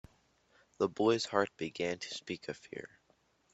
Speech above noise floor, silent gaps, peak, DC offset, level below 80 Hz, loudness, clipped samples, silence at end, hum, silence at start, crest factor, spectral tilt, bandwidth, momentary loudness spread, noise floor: 37 dB; none; -14 dBFS; under 0.1%; -72 dBFS; -35 LUFS; under 0.1%; 0.7 s; none; 0.8 s; 24 dB; -4.5 dB/octave; 8.2 kHz; 17 LU; -72 dBFS